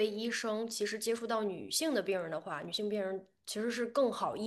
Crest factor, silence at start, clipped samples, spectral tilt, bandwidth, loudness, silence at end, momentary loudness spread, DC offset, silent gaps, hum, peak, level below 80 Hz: 18 dB; 0 s; under 0.1%; -3 dB/octave; 12.5 kHz; -35 LUFS; 0 s; 7 LU; under 0.1%; none; none; -18 dBFS; -80 dBFS